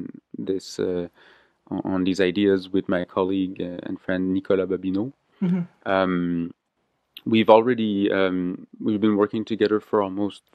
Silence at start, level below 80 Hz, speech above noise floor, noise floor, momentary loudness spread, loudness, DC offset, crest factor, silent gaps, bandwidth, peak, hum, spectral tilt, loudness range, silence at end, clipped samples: 0 s; -64 dBFS; 50 dB; -73 dBFS; 10 LU; -23 LUFS; under 0.1%; 22 dB; none; 9.4 kHz; 0 dBFS; none; -7 dB/octave; 4 LU; 0.2 s; under 0.1%